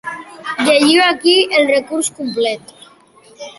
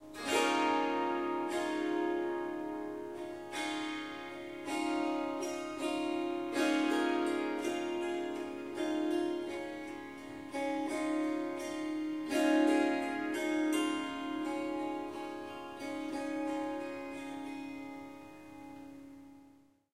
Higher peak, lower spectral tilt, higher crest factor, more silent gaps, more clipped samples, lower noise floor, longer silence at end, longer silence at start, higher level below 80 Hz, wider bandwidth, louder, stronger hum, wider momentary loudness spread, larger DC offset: first, 0 dBFS vs -18 dBFS; second, -2 dB/octave vs -3.5 dB/octave; about the same, 14 dB vs 18 dB; neither; neither; second, -46 dBFS vs -63 dBFS; second, 0.05 s vs 0.45 s; about the same, 0.05 s vs 0 s; first, -64 dBFS vs -72 dBFS; second, 12 kHz vs 15 kHz; first, -13 LUFS vs -35 LUFS; neither; first, 17 LU vs 14 LU; neither